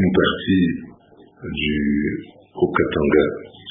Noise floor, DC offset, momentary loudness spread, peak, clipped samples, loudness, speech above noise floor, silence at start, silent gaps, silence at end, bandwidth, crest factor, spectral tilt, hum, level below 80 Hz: -49 dBFS; under 0.1%; 15 LU; -4 dBFS; under 0.1%; -20 LUFS; 29 dB; 0 s; none; 0 s; 3.8 kHz; 18 dB; -11.5 dB/octave; none; -40 dBFS